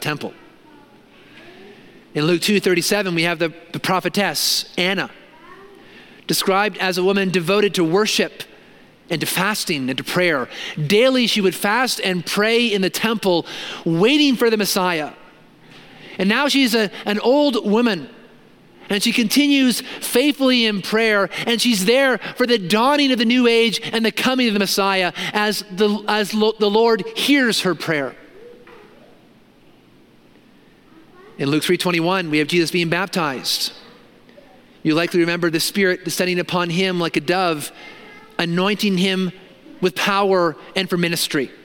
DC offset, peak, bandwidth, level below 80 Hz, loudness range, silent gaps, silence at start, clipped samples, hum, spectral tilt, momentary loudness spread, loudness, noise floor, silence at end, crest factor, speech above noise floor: under 0.1%; 0 dBFS; 17 kHz; -62 dBFS; 4 LU; none; 0 s; under 0.1%; none; -4 dB/octave; 9 LU; -18 LUFS; -50 dBFS; 0.1 s; 18 dB; 32 dB